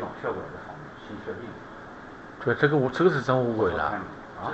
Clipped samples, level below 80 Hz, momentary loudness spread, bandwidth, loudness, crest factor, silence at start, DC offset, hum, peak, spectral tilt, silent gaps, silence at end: under 0.1%; -56 dBFS; 20 LU; 8.2 kHz; -26 LUFS; 20 dB; 0 s; under 0.1%; none; -6 dBFS; -7.5 dB/octave; none; 0 s